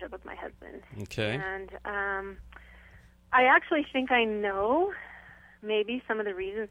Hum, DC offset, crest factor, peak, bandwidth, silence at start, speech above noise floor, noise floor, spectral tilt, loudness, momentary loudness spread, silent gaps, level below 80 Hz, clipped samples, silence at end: none; under 0.1%; 20 dB; -10 dBFS; 12.5 kHz; 0 s; 27 dB; -55 dBFS; -5.5 dB/octave; -28 LUFS; 20 LU; none; -56 dBFS; under 0.1%; 0.05 s